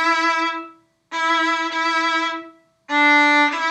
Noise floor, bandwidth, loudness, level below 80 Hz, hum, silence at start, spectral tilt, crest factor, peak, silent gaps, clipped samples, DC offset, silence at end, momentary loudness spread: -44 dBFS; 11 kHz; -17 LUFS; -78 dBFS; none; 0 s; -0.5 dB/octave; 14 dB; -6 dBFS; none; under 0.1%; under 0.1%; 0 s; 13 LU